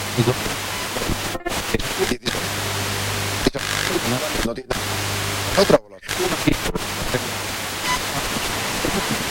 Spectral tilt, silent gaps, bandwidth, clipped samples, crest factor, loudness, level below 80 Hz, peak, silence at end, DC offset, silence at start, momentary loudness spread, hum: -3.5 dB/octave; none; 16.5 kHz; under 0.1%; 20 dB; -22 LUFS; -36 dBFS; -2 dBFS; 0 s; under 0.1%; 0 s; 5 LU; none